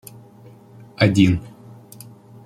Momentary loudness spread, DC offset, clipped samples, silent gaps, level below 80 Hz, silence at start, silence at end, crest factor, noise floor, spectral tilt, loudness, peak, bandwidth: 27 LU; under 0.1%; under 0.1%; none; -50 dBFS; 1 s; 0.95 s; 20 dB; -45 dBFS; -6.5 dB/octave; -18 LUFS; -2 dBFS; 14.5 kHz